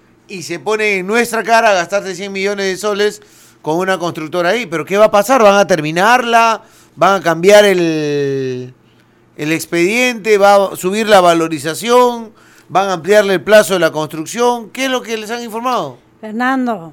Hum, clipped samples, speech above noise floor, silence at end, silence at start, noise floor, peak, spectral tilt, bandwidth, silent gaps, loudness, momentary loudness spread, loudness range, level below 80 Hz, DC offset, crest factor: none; under 0.1%; 36 dB; 0 s; 0.3 s; -49 dBFS; 0 dBFS; -4 dB/octave; 18.5 kHz; none; -13 LUFS; 12 LU; 5 LU; -56 dBFS; under 0.1%; 14 dB